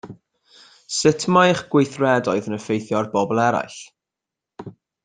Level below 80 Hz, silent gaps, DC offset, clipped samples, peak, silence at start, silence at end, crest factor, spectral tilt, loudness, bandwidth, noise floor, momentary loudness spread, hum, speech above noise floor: -62 dBFS; none; under 0.1%; under 0.1%; -2 dBFS; 0.05 s; 0.35 s; 20 dB; -5 dB/octave; -20 LUFS; 9.6 kHz; -86 dBFS; 23 LU; none; 67 dB